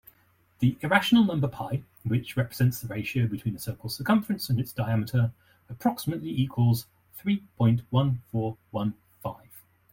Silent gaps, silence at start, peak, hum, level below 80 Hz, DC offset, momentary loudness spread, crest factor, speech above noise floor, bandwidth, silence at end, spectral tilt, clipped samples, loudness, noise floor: none; 0.6 s; -6 dBFS; none; -58 dBFS; under 0.1%; 11 LU; 20 dB; 38 dB; 17 kHz; 0.35 s; -6.5 dB/octave; under 0.1%; -27 LUFS; -64 dBFS